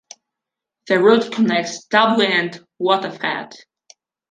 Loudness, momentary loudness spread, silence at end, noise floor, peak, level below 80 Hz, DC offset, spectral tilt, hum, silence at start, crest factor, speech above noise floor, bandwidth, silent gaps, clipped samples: -18 LUFS; 11 LU; 0.75 s; -84 dBFS; -2 dBFS; -68 dBFS; under 0.1%; -4.5 dB/octave; none; 0.85 s; 18 dB; 67 dB; 9.4 kHz; none; under 0.1%